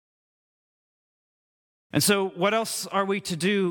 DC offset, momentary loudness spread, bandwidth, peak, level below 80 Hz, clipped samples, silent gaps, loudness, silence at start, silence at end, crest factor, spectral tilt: under 0.1%; 5 LU; 18 kHz; -8 dBFS; -70 dBFS; under 0.1%; none; -25 LUFS; 1.95 s; 0 s; 20 dB; -4 dB/octave